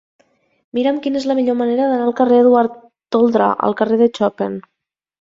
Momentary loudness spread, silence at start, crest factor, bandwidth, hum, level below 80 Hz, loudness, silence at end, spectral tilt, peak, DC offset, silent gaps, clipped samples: 10 LU; 0.75 s; 16 dB; 7.6 kHz; none; -62 dBFS; -16 LUFS; 0.6 s; -7 dB/octave; -2 dBFS; under 0.1%; none; under 0.1%